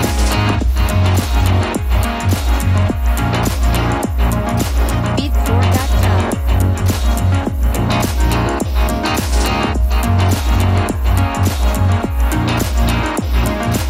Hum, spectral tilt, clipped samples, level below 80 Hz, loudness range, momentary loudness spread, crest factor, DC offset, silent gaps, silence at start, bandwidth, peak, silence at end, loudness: none; -5.5 dB/octave; under 0.1%; -18 dBFS; 1 LU; 3 LU; 12 dB; under 0.1%; none; 0 s; 16 kHz; -2 dBFS; 0 s; -16 LUFS